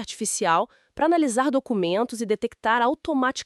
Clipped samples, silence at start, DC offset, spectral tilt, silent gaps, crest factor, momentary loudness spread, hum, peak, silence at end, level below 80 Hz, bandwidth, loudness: under 0.1%; 0 s; under 0.1%; -3.5 dB/octave; none; 16 dB; 5 LU; none; -6 dBFS; 0 s; -60 dBFS; 13.5 kHz; -23 LUFS